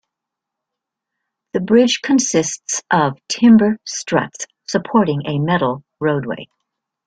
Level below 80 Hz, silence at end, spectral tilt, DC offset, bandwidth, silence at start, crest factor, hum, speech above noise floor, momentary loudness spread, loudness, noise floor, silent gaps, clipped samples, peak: -58 dBFS; 0.6 s; -4.5 dB/octave; under 0.1%; 9.4 kHz; 1.55 s; 16 dB; none; 66 dB; 12 LU; -17 LUFS; -82 dBFS; none; under 0.1%; -2 dBFS